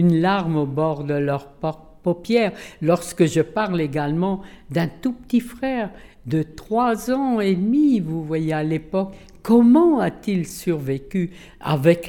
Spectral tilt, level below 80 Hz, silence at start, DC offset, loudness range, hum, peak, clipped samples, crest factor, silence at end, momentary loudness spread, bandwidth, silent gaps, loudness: -7 dB/octave; -50 dBFS; 0 s; under 0.1%; 5 LU; none; -4 dBFS; under 0.1%; 16 dB; 0 s; 10 LU; 18 kHz; none; -21 LUFS